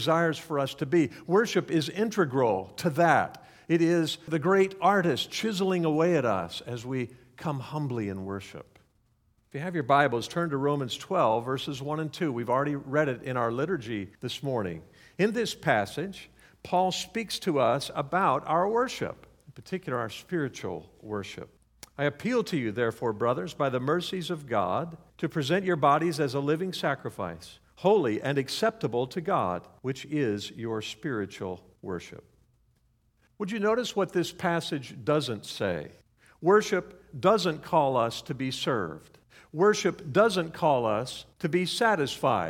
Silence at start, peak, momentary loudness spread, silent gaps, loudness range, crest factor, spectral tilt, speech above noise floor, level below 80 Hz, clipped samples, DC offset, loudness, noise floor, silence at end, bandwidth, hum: 0 s; -8 dBFS; 13 LU; none; 7 LU; 22 dB; -5.5 dB/octave; 41 dB; -64 dBFS; under 0.1%; under 0.1%; -28 LUFS; -68 dBFS; 0 s; 17 kHz; none